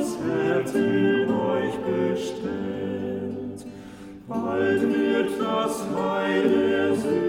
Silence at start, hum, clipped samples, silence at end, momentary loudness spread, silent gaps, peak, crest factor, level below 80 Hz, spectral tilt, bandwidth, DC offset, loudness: 0 s; none; under 0.1%; 0 s; 12 LU; none; -10 dBFS; 14 dB; -60 dBFS; -6 dB/octave; 16 kHz; under 0.1%; -24 LUFS